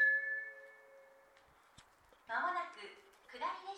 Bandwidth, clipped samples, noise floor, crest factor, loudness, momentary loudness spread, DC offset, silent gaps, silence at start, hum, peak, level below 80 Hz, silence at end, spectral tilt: 13 kHz; under 0.1%; -67 dBFS; 18 dB; -39 LUFS; 24 LU; under 0.1%; none; 0 s; none; -24 dBFS; -82 dBFS; 0 s; -2 dB/octave